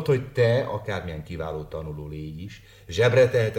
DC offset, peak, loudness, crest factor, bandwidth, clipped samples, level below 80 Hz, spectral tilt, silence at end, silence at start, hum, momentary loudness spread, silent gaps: under 0.1%; -8 dBFS; -25 LUFS; 18 dB; 16 kHz; under 0.1%; -46 dBFS; -6.5 dB/octave; 0 s; 0 s; none; 17 LU; none